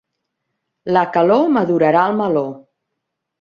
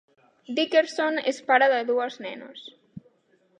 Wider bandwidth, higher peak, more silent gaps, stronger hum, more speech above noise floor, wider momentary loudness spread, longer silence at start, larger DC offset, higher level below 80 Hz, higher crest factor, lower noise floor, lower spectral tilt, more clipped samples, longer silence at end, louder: second, 7 kHz vs 10 kHz; first, -2 dBFS vs -6 dBFS; neither; neither; first, 62 dB vs 41 dB; second, 8 LU vs 21 LU; first, 0.85 s vs 0.5 s; neither; first, -64 dBFS vs -78 dBFS; about the same, 16 dB vs 20 dB; first, -77 dBFS vs -65 dBFS; first, -8.5 dB/octave vs -3 dB/octave; neither; first, 0.8 s vs 0.6 s; first, -15 LUFS vs -23 LUFS